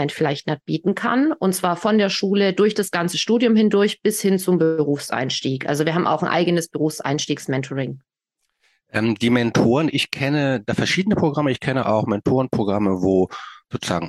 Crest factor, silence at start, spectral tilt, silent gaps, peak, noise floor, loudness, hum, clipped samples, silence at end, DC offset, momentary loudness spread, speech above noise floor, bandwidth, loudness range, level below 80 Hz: 16 dB; 0 s; -5.5 dB/octave; none; -4 dBFS; -76 dBFS; -20 LUFS; none; under 0.1%; 0 s; under 0.1%; 7 LU; 56 dB; 12.5 kHz; 4 LU; -56 dBFS